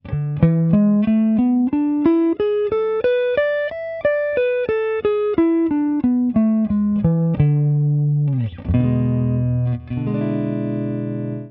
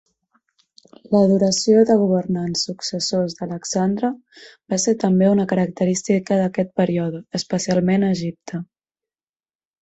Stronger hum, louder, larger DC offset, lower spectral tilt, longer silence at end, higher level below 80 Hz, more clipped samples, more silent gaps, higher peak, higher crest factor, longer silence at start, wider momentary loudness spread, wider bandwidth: neither; about the same, -19 LUFS vs -19 LUFS; neither; first, -12.5 dB/octave vs -5.5 dB/octave; second, 0 s vs 1.15 s; first, -42 dBFS vs -58 dBFS; neither; neither; about the same, -2 dBFS vs -4 dBFS; about the same, 16 dB vs 16 dB; second, 0.05 s vs 1.1 s; second, 7 LU vs 10 LU; second, 4.1 kHz vs 8.2 kHz